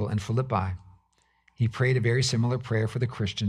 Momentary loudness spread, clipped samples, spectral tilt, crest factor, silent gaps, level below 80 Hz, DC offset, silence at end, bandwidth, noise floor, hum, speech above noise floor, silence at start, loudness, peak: 6 LU; under 0.1%; -5.5 dB/octave; 14 dB; none; -54 dBFS; under 0.1%; 0 s; 11 kHz; -68 dBFS; none; 42 dB; 0 s; -27 LUFS; -12 dBFS